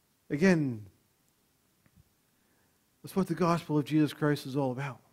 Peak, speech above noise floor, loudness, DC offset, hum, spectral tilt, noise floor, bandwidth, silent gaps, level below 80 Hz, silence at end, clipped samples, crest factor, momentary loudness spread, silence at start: -12 dBFS; 42 dB; -30 LUFS; under 0.1%; none; -7 dB/octave; -71 dBFS; 16 kHz; none; -66 dBFS; 0.2 s; under 0.1%; 20 dB; 12 LU; 0.3 s